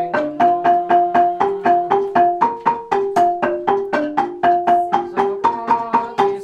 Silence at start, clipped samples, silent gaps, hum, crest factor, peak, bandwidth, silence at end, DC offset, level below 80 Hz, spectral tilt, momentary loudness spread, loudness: 0 s; under 0.1%; none; none; 14 dB; -2 dBFS; 8.8 kHz; 0 s; under 0.1%; -56 dBFS; -6 dB/octave; 5 LU; -17 LUFS